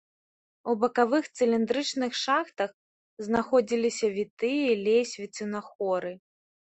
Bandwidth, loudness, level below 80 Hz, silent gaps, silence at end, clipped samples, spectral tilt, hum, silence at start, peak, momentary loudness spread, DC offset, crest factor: 8.4 kHz; -27 LUFS; -70 dBFS; 2.74-3.17 s, 4.30-4.37 s, 5.75-5.79 s; 0.5 s; under 0.1%; -4 dB/octave; none; 0.65 s; -8 dBFS; 10 LU; under 0.1%; 20 dB